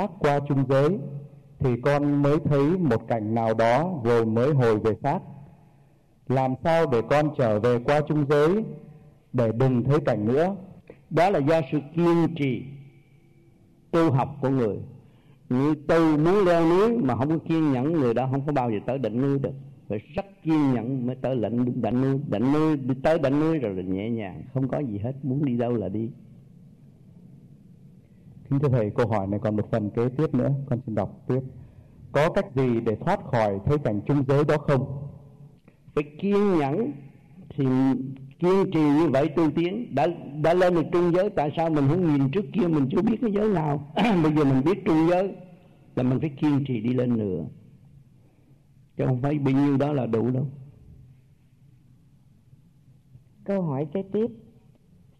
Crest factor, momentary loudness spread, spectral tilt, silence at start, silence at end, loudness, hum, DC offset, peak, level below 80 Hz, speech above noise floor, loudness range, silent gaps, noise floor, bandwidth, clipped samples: 14 dB; 10 LU; -8.5 dB/octave; 0 s; 0.8 s; -24 LUFS; none; under 0.1%; -10 dBFS; -52 dBFS; 35 dB; 6 LU; none; -58 dBFS; 11 kHz; under 0.1%